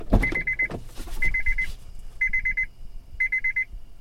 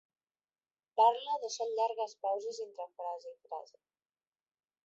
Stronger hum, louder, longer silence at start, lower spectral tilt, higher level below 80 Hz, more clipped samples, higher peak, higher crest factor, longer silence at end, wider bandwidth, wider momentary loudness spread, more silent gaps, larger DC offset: neither; first, -25 LUFS vs -34 LUFS; second, 0 s vs 0.95 s; first, -6 dB/octave vs 1.5 dB/octave; first, -32 dBFS vs under -90 dBFS; neither; first, -6 dBFS vs -16 dBFS; about the same, 20 dB vs 22 dB; second, 0 s vs 1.25 s; first, 14 kHz vs 8 kHz; second, 10 LU vs 18 LU; neither; neither